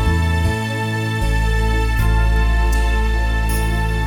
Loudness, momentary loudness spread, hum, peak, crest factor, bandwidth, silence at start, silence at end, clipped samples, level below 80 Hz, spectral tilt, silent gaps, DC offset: -19 LUFS; 3 LU; none; -6 dBFS; 12 dB; 18.5 kHz; 0 s; 0 s; under 0.1%; -18 dBFS; -5.5 dB/octave; none; under 0.1%